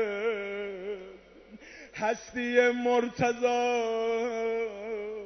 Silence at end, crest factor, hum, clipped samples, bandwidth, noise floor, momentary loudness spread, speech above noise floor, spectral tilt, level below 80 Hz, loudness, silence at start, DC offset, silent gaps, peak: 0 s; 20 dB; none; under 0.1%; 6.4 kHz; -51 dBFS; 16 LU; 24 dB; -4.5 dB/octave; -64 dBFS; -29 LUFS; 0 s; under 0.1%; none; -10 dBFS